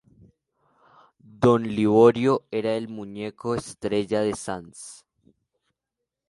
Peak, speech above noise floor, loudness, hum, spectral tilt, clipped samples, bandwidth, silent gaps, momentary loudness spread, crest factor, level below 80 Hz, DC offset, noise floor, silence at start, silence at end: -4 dBFS; 62 dB; -23 LUFS; none; -6.5 dB/octave; under 0.1%; 11.5 kHz; none; 18 LU; 22 dB; -58 dBFS; under 0.1%; -85 dBFS; 1.4 s; 1.35 s